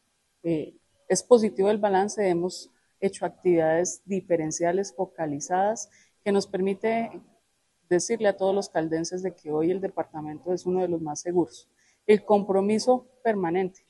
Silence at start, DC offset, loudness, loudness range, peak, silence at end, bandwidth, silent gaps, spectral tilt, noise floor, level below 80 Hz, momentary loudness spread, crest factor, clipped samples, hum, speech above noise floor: 0.45 s; under 0.1%; -26 LUFS; 4 LU; -4 dBFS; 0.2 s; 12 kHz; none; -5 dB/octave; -71 dBFS; -70 dBFS; 11 LU; 22 dB; under 0.1%; none; 46 dB